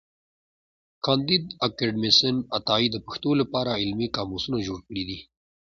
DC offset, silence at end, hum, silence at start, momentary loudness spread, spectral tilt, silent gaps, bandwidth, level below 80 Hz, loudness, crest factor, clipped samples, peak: under 0.1%; 0.45 s; none; 1.05 s; 13 LU; -5 dB/octave; none; 7.4 kHz; -54 dBFS; -24 LUFS; 22 dB; under 0.1%; -6 dBFS